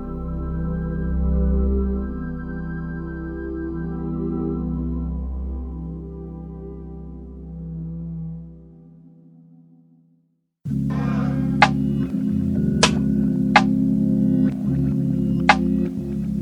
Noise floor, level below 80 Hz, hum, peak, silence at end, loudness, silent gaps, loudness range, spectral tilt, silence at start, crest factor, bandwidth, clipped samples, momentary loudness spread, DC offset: -66 dBFS; -32 dBFS; none; 0 dBFS; 0 s; -22 LUFS; none; 16 LU; -6 dB/octave; 0 s; 22 dB; 11 kHz; under 0.1%; 17 LU; under 0.1%